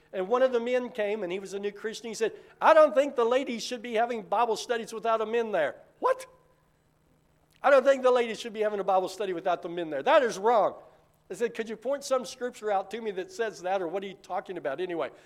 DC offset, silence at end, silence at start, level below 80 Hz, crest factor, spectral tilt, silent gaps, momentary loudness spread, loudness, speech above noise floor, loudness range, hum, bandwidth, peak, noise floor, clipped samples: under 0.1%; 0.15 s; 0.15 s; -74 dBFS; 20 dB; -3.5 dB/octave; none; 12 LU; -28 LUFS; 39 dB; 6 LU; none; 14.5 kHz; -8 dBFS; -67 dBFS; under 0.1%